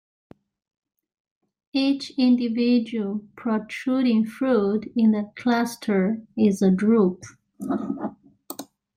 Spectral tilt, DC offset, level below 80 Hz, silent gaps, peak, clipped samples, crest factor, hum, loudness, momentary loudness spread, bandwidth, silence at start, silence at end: -6.5 dB/octave; under 0.1%; -66 dBFS; none; -8 dBFS; under 0.1%; 16 dB; none; -23 LUFS; 12 LU; 16 kHz; 1.75 s; 0.35 s